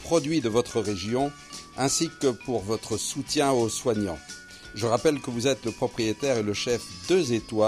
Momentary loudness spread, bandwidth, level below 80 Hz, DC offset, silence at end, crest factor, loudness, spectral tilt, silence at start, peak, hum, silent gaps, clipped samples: 7 LU; 16 kHz; -54 dBFS; under 0.1%; 0 s; 18 dB; -26 LUFS; -4 dB/octave; 0 s; -10 dBFS; none; none; under 0.1%